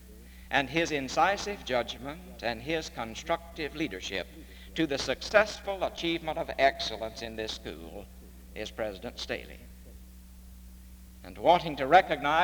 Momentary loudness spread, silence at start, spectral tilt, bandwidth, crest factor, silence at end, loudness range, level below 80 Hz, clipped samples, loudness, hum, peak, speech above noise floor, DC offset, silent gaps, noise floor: 24 LU; 0 s; -4 dB/octave; over 20 kHz; 24 dB; 0 s; 10 LU; -50 dBFS; under 0.1%; -30 LUFS; none; -8 dBFS; 19 dB; under 0.1%; none; -49 dBFS